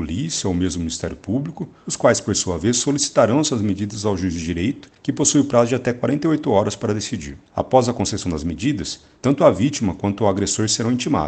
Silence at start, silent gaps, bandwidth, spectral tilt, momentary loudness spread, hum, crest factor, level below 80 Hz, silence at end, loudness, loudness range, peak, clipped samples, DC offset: 0 s; none; 9.4 kHz; -4.5 dB/octave; 10 LU; none; 20 dB; -44 dBFS; 0 s; -20 LUFS; 2 LU; 0 dBFS; under 0.1%; under 0.1%